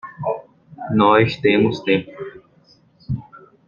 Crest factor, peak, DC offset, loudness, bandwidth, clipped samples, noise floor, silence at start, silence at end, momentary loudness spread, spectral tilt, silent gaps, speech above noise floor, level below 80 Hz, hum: 18 dB; -2 dBFS; under 0.1%; -18 LUFS; 7.2 kHz; under 0.1%; -54 dBFS; 0.05 s; 0.3 s; 20 LU; -7.5 dB/octave; none; 38 dB; -52 dBFS; none